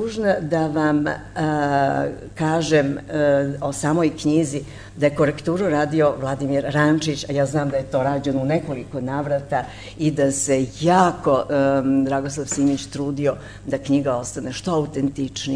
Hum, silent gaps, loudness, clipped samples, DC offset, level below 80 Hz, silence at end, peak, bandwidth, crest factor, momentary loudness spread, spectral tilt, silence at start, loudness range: 50 Hz at -40 dBFS; none; -21 LUFS; under 0.1%; under 0.1%; -48 dBFS; 0 s; -4 dBFS; 11 kHz; 18 dB; 8 LU; -5.5 dB/octave; 0 s; 3 LU